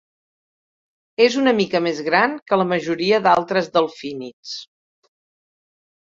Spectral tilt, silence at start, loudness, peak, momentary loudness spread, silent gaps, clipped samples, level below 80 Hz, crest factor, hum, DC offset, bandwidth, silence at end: -5 dB/octave; 1.2 s; -18 LUFS; -2 dBFS; 16 LU; 2.42-2.46 s, 4.33-4.43 s; under 0.1%; -66 dBFS; 20 dB; none; under 0.1%; 7.8 kHz; 1.4 s